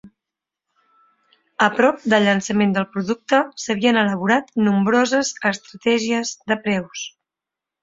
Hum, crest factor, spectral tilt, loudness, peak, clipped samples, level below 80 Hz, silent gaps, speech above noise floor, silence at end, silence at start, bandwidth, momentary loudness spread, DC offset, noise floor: none; 20 dB; -4.5 dB/octave; -19 LUFS; 0 dBFS; under 0.1%; -62 dBFS; none; 68 dB; 0.75 s; 0.05 s; 7.8 kHz; 8 LU; under 0.1%; -87 dBFS